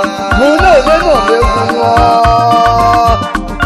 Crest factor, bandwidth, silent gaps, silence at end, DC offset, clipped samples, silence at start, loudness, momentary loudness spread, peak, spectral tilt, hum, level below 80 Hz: 8 dB; 13.5 kHz; none; 0 s; under 0.1%; under 0.1%; 0 s; -8 LUFS; 4 LU; 0 dBFS; -5.5 dB/octave; none; -20 dBFS